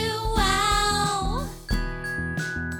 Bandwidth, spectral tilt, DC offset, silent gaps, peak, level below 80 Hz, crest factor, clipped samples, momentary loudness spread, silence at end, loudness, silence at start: over 20 kHz; -3.5 dB/octave; under 0.1%; none; -8 dBFS; -32 dBFS; 16 dB; under 0.1%; 9 LU; 0 s; -25 LUFS; 0 s